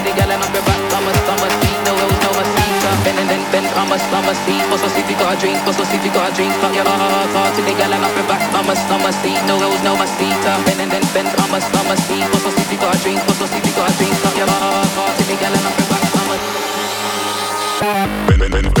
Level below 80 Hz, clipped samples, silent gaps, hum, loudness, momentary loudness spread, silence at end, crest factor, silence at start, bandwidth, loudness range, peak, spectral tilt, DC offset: -30 dBFS; under 0.1%; none; none; -15 LUFS; 2 LU; 0 s; 14 dB; 0 s; 19.5 kHz; 1 LU; 0 dBFS; -4 dB/octave; under 0.1%